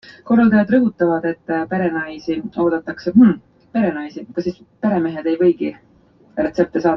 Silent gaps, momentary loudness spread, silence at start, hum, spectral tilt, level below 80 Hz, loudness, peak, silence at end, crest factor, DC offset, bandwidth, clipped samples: none; 12 LU; 0.1 s; none; -8.5 dB/octave; -54 dBFS; -18 LUFS; -2 dBFS; 0 s; 16 dB; under 0.1%; 6.2 kHz; under 0.1%